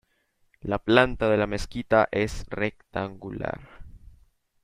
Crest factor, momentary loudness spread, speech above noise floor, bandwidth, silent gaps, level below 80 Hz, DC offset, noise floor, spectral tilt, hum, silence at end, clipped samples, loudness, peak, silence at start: 26 dB; 14 LU; 44 dB; 15 kHz; none; -44 dBFS; under 0.1%; -69 dBFS; -6 dB/octave; none; 0.65 s; under 0.1%; -26 LUFS; -2 dBFS; 0.65 s